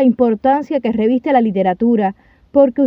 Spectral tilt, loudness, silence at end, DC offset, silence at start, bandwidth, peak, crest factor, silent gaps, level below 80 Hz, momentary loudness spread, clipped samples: -9.5 dB/octave; -15 LUFS; 0 s; under 0.1%; 0 s; 5.2 kHz; 0 dBFS; 14 dB; none; -52 dBFS; 4 LU; under 0.1%